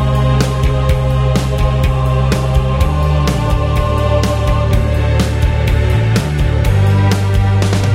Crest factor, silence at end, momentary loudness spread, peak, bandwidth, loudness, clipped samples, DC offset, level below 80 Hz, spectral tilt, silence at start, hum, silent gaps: 12 dB; 0 s; 2 LU; 0 dBFS; 16 kHz; -14 LUFS; under 0.1%; under 0.1%; -18 dBFS; -6.5 dB/octave; 0 s; none; none